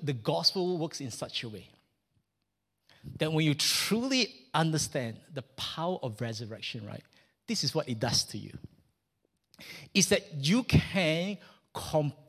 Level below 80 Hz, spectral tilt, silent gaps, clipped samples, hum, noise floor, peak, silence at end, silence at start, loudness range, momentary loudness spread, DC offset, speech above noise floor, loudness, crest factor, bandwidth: -54 dBFS; -4 dB/octave; none; under 0.1%; none; -83 dBFS; -10 dBFS; 0.1 s; 0 s; 5 LU; 18 LU; under 0.1%; 52 dB; -30 LUFS; 22 dB; 15.5 kHz